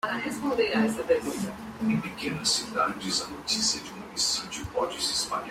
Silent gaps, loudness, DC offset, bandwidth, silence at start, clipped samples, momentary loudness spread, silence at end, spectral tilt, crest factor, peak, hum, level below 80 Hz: none; -28 LUFS; under 0.1%; 16 kHz; 0.05 s; under 0.1%; 7 LU; 0 s; -2.5 dB/octave; 18 dB; -12 dBFS; none; -56 dBFS